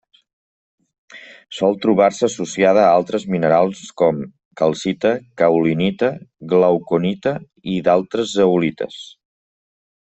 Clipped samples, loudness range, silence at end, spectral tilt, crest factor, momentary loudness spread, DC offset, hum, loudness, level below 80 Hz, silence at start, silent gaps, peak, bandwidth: under 0.1%; 2 LU; 1.1 s; -6 dB/octave; 16 dB; 11 LU; under 0.1%; none; -17 LUFS; -58 dBFS; 1.15 s; 4.45-4.51 s; -2 dBFS; 8.4 kHz